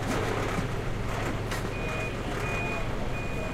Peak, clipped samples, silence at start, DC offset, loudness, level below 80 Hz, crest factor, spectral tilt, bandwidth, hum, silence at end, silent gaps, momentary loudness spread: -16 dBFS; under 0.1%; 0 s; under 0.1%; -31 LUFS; -36 dBFS; 14 dB; -5.5 dB/octave; 16 kHz; none; 0 s; none; 4 LU